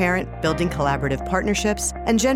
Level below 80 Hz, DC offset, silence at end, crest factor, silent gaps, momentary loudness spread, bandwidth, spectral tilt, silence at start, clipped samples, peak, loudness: -34 dBFS; under 0.1%; 0 s; 16 dB; none; 3 LU; 16.5 kHz; -4.5 dB/octave; 0 s; under 0.1%; -6 dBFS; -22 LUFS